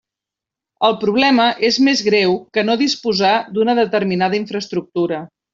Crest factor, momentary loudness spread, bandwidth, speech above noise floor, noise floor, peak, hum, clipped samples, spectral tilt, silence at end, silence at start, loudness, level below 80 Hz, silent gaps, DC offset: 14 dB; 8 LU; 7.6 kHz; 70 dB; -86 dBFS; -2 dBFS; none; under 0.1%; -4.5 dB/octave; 0.3 s; 0.8 s; -16 LUFS; -62 dBFS; none; under 0.1%